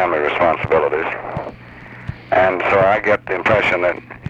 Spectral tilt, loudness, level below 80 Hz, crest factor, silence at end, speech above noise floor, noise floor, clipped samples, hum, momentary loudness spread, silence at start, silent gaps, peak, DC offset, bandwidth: -6.5 dB/octave; -16 LUFS; -44 dBFS; 14 dB; 0 s; 21 dB; -37 dBFS; under 0.1%; none; 18 LU; 0 s; none; -4 dBFS; under 0.1%; 8.2 kHz